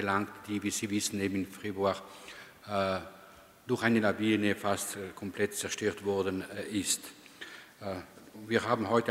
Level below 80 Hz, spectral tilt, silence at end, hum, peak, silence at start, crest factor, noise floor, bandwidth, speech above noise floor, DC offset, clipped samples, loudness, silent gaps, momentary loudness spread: -70 dBFS; -4 dB/octave; 0 s; none; -12 dBFS; 0 s; 22 dB; -55 dBFS; 16 kHz; 23 dB; under 0.1%; under 0.1%; -32 LUFS; none; 19 LU